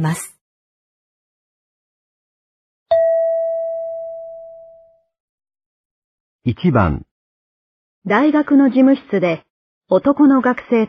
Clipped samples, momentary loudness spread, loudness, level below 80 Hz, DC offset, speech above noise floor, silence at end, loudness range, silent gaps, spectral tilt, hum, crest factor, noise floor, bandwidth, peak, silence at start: under 0.1%; 17 LU; -16 LUFS; -46 dBFS; under 0.1%; 35 dB; 0 s; 9 LU; 0.41-2.86 s, 5.20-5.38 s, 5.66-6.39 s, 7.11-8.02 s, 9.50-9.81 s; -7.5 dB/octave; none; 18 dB; -49 dBFS; 12 kHz; 0 dBFS; 0 s